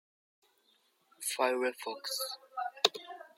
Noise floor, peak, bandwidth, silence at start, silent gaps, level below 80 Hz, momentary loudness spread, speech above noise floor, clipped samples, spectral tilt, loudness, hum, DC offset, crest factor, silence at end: -72 dBFS; -8 dBFS; 16.5 kHz; 1.2 s; none; under -90 dBFS; 10 LU; 37 dB; under 0.1%; 0 dB/octave; -34 LUFS; none; under 0.1%; 30 dB; 0.1 s